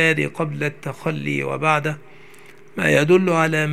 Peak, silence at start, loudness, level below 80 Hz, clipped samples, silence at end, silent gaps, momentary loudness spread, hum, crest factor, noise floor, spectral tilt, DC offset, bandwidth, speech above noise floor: 0 dBFS; 0 s; -20 LUFS; -62 dBFS; under 0.1%; 0 s; none; 12 LU; none; 20 dB; -47 dBFS; -6 dB/octave; 0.6%; 15 kHz; 27 dB